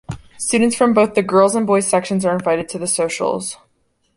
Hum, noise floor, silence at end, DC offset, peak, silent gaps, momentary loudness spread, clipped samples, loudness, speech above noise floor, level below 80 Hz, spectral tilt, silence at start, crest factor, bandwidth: none; -64 dBFS; 0.6 s; under 0.1%; -2 dBFS; none; 10 LU; under 0.1%; -17 LUFS; 47 dB; -52 dBFS; -4.5 dB/octave; 0.1 s; 16 dB; 11.5 kHz